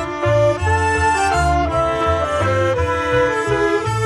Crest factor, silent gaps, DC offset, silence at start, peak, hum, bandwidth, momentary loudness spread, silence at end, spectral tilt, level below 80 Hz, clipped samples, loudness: 12 dB; none; under 0.1%; 0 s; -4 dBFS; none; 12.5 kHz; 2 LU; 0 s; -5.5 dB/octave; -30 dBFS; under 0.1%; -17 LUFS